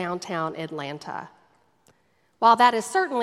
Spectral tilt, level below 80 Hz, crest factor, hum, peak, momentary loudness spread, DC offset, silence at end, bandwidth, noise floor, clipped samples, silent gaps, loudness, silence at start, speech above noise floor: -4 dB/octave; -76 dBFS; 22 dB; none; -2 dBFS; 18 LU; under 0.1%; 0 s; 14 kHz; -67 dBFS; under 0.1%; none; -23 LUFS; 0 s; 43 dB